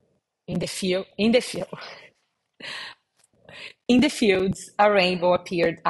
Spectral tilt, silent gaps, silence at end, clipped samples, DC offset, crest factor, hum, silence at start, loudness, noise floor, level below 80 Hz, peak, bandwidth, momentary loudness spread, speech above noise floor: -5 dB/octave; none; 0 s; under 0.1%; under 0.1%; 18 dB; none; 0.5 s; -22 LUFS; -72 dBFS; -56 dBFS; -6 dBFS; 13 kHz; 20 LU; 49 dB